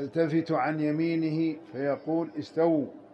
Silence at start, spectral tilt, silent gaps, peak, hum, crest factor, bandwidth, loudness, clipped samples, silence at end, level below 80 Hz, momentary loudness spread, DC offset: 0 s; -8.5 dB/octave; none; -14 dBFS; none; 14 dB; 6.4 kHz; -28 LUFS; under 0.1%; 0.1 s; -76 dBFS; 5 LU; under 0.1%